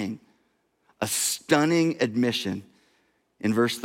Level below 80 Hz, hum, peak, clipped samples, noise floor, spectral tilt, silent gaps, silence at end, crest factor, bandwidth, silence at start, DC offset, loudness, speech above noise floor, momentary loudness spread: -72 dBFS; none; -8 dBFS; under 0.1%; -70 dBFS; -4 dB/octave; none; 0 s; 20 dB; 16.5 kHz; 0 s; under 0.1%; -25 LUFS; 46 dB; 12 LU